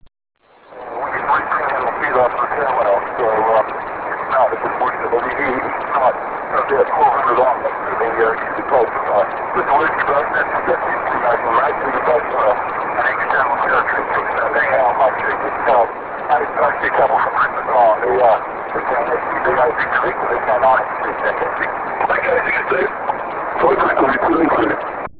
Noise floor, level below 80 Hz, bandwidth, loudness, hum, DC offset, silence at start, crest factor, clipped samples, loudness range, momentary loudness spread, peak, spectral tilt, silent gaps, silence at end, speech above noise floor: -37 dBFS; -48 dBFS; 4 kHz; -17 LUFS; none; under 0.1%; 0.05 s; 14 dB; under 0.1%; 2 LU; 6 LU; -2 dBFS; -8.5 dB/octave; none; 0 s; 21 dB